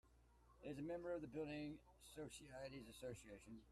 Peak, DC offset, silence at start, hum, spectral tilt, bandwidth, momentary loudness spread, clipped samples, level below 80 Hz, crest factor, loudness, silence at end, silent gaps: -38 dBFS; under 0.1%; 0.05 s; none; -5.5 dB/octave; 14.5 kHz; 11 LU; under 0.1%; -72 dBFS; 16 dB; -54 LUFS; 0 s; none